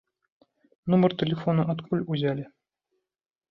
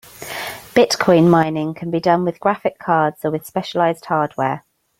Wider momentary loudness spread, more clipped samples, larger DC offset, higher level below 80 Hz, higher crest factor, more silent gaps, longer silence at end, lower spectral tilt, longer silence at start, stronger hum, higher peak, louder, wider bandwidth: about the same, 13 LU vs 12 LU; neither; neither; second, -64 dBFS vs -58 dBFS; about the same, 18 dB vs 18 dB; neither; first, 1.05 s vs 0.4 s; first, -10 dB/octave vs -6 dB/octave; first, 0.85 s vs 0.2 s; neither; second, -10 dBFS vs 0 dBFS; second, -26 LUFS vs -18 LUFS; second, 5.6 kHz vs 16.5 kHz